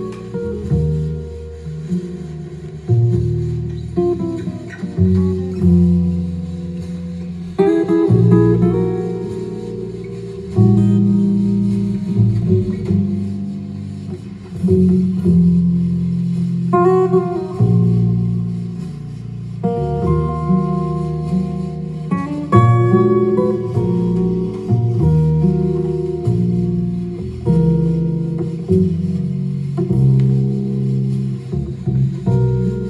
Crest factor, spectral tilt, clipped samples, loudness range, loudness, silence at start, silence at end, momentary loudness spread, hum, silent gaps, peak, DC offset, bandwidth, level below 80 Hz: 16 dB; -10.5 dB/octave; under 0.1%; 5 LU; -17 LUFS; 0 s; 0 s; 14 LU; none; none; 0 dBFS; under 0.1%; 9.4 kHz; -38 dBFS